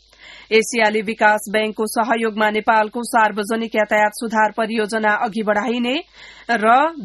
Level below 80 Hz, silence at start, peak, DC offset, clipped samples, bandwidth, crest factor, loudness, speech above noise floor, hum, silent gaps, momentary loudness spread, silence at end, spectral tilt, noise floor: -60 dBFS; 0.25 s; 0 dBFS; under 0.1%; under 0.1%; 12.5 kHz; 18 dB; -18 LUFS; 25 dB; none; none; 6 LU; 0 s; -3.5 dB/octave; -43 dBFS